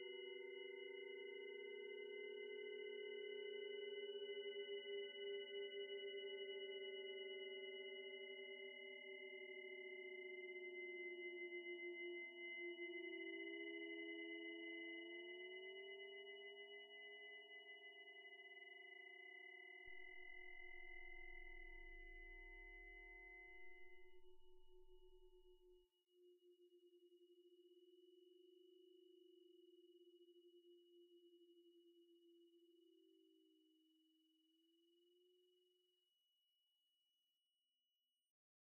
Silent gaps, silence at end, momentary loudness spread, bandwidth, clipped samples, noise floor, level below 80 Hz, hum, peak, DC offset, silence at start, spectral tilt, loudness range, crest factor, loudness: none; 3.1 s; 9 LU; 3.1 kHz; under 0.1%; under -90 dBFS; -74 dBFS; none; -42 dBFS; under 0.1%; 0 s; 1 dB/octave; 9 LU; 16 dB; -54 LUFS